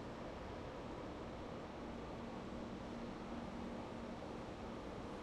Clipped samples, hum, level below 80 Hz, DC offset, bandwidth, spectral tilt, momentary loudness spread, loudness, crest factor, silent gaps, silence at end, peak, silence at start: under 0.1%; none; -60 dBFS; under 0.1%; 12.5 kHz; -6.5 dB/octave; 1 LU; -49 LUFS; 12 dB; none; 0 s; -36 dBFS; 0 s